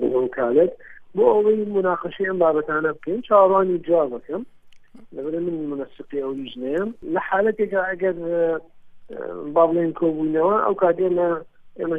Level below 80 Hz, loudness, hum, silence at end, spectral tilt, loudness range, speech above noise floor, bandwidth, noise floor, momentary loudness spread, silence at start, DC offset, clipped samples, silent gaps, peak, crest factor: -58 dBFS; -21 LUFS; none; 0 s; -9 dB/octave; 7 LU; 23 dB; 3.8 kHz; -44 dBFS; 13 LU; 0 s; under 0.1%; under 0.1%; none; -4 dBFS; 18 dB